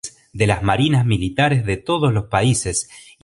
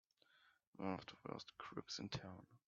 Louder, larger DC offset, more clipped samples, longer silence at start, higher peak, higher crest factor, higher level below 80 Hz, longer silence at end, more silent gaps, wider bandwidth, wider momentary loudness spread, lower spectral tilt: first, -18 LUFS vs -50 LUFS; neither; neither; second, 0.05 s vs 0.35 s; first, 0 dBFS vs -30 dBFS; about the same, 18 dB vs 22 dB; first, -38 dBFS vs -78 dBFS; first, 0.25 s vs 0.1 s; second, none vs 0.67-0.73 s; first, 11.5 kHz vs 7.4 kHz; about the same, 7 LU vs 7 LU; about the same, -5 dB/octave vs -4 dB/octave